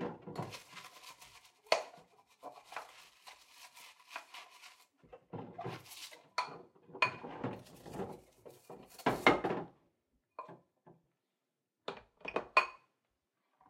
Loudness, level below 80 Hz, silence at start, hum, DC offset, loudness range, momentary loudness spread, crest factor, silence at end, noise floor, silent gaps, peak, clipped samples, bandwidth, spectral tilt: -38 LUFS; -72 dBFS; 0 s; none; under 0.1%; 14 LU; 24 LU; 30 dB; 0.95 s; -88 dBFS; none; -10 dBFS; under 0.1%; 16 kHz; -4 dB/octave